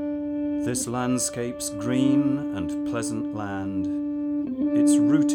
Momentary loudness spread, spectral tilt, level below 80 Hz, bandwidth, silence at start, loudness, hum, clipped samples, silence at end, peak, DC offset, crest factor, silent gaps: 10 LU; -5 dB/octave; -56 dBFS; 16 kHz; 0 s; -25 LUFS; none; under 0.1%; 0 s; -10 dBFS; under 0.1%; 14 dB; none